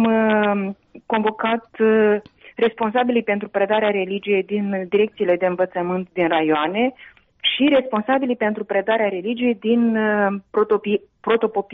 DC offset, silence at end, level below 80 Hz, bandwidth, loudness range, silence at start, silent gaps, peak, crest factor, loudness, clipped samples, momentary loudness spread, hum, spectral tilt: under 0.1%; 0 s; -62 dBFS; 4 kHz; 1 LU; 0 s; none; -6 dBFS; 14 dB; -20 LUFS; under 0.1%; 6 LU; none; -3.5 dB/octave